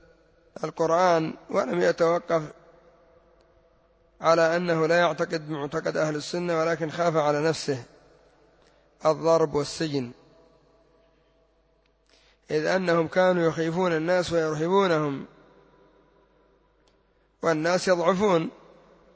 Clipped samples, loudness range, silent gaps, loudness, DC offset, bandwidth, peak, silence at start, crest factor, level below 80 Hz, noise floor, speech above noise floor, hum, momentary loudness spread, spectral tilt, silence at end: under 0.1%; 5 LU; none; -25 LUFS; under 0.1%; 8 kHz; -8 dBFS; 0.6 s; 20 dB; -62 dBFS; -65 dBFS; 41 dB; none; 9 LU; -5.5 dB/octave; 0.65 s